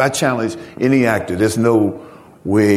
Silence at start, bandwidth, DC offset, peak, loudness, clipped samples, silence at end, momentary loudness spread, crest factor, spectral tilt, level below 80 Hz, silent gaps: 0 s; 15.5 kHz; under 0.1%; 0 dBFS; -17 LUFS; under 0.1%; 0 s; 9 LU; 16 dB; -5.5 dB/octave; -50 dBFS; none